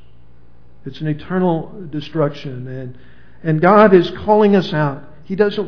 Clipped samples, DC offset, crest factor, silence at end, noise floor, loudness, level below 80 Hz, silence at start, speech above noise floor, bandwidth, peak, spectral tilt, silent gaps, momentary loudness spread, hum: under 0.1%; 2%; 16 dB; 0 s; -48 dBFS; -15 LUFS; -48 dBFS; 0.85 s; 33 dB; 5.4 kHz; 0 dBFS; -8.5 dB/octave; none; 20 LU; none